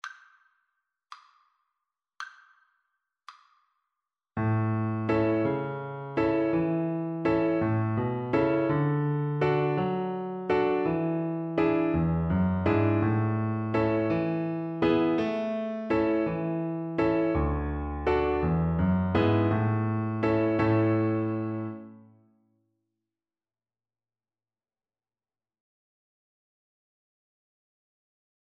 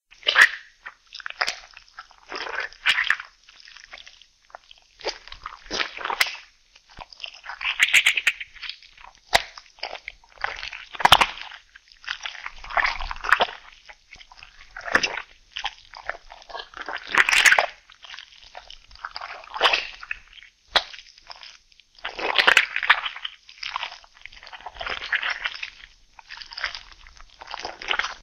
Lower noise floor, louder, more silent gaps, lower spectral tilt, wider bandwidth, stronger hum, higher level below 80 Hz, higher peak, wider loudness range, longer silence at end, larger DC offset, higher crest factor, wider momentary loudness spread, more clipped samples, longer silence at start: first, under -90 dBFS vs -55 dBFS; second, -27 LUFS vs -22 LUFS; neither; first, -9.5 dB/octave vs 0 dB/octave; second, 6.4 kHz vs 16 kHz; neither; about the same, -46 dBFS vs -50 dBFS; second, -10 dBFS vs 0 dBFS; second, 5 LU vs 8 LU; first, 6.4 s vs 0 s; neither; second, 18 dB vs 26 dB; second, 7 LU vs 26 LU; neither; second, 0.05 s vs 0.25 s